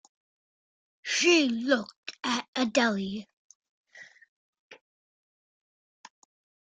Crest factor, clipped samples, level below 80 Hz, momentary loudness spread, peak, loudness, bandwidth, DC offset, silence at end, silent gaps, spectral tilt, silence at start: 22 dB; under 0.1%; -76 dBFS; 17 LU; -10 dBFS; -26 LUFS; 9.4 kHz; under 0.1%; 1.95 s; 1.96-2.03 s, 2.48-2.53 s, 3.33-3.62 s, 3.69-3.84 s, 4.28-4.53 s, 4.59-4.70 s; -3 dB/octave; 1.05 s